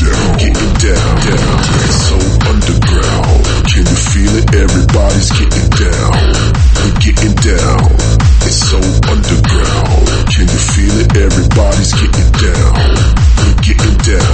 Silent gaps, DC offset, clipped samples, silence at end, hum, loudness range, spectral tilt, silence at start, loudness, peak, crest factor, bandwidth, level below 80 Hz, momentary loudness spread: none; under 0.1%; 0.3%; 0 s; none; 1 LU; -5 dB/octave; 0 s; -10 LUFS; 0 dBFS; 8 dB; 8.8 kHz; -10 dBFS; 2 LU